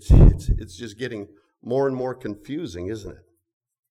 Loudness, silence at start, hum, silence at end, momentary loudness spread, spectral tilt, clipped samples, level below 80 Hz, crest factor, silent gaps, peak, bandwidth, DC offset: -24 LUFS; 0.05 s; none; 0.75 s; 20 LU; -8 dB/octave; under 0.1%; -24 dBFS; 18 dB; none; -4 dBFS; 10 kHz; under 0.1%